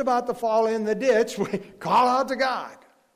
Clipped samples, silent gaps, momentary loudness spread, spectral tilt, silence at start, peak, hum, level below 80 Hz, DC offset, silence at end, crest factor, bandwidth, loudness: under 0.1%; none; 10 LU; -4.5 dB/octave; 0 s; -10 dBFS; none; -64 dBFS; under 0.1%; 0.4 s; 12 dB; 15.5 kHz; -23 LUFS